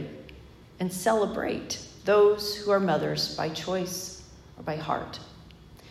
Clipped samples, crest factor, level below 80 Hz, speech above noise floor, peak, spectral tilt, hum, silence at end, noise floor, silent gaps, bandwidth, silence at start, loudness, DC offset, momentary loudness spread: under 0.1%; 18 dB; -56 dBFS; 23 dB; -12 dBFS; -4.5 dB/octave; none; 0 s; -49 dBFS; none; 14.5 kHz; 0 s; -27 LUFS; under 0.1%; 19 LU